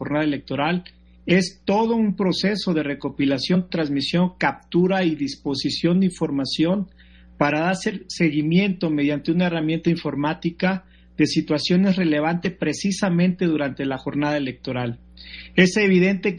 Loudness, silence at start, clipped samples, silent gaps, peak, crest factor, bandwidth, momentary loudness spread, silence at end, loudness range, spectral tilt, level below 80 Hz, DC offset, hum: -22 LUFS; 0 s; under 0.1%; none; -2 dBFS; 20 dB; 10.5 kHz; 8 LU; 0 s; 1 LU; -6 dB/octave; -52 dBFS; under 0.1%; none